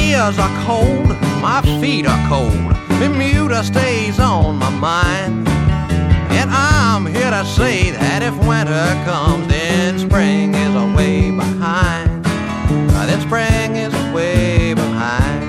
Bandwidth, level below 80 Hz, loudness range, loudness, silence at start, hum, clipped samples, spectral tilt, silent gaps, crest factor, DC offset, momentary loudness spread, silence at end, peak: 14.5 kHz; -24 dBFS; 1 LU; -15 LUFS; 0 s; none; under 0.1%; -6 dB/octave; none; 14 dB; under 0.1%; 3 LU; 0 s; 0 dBFS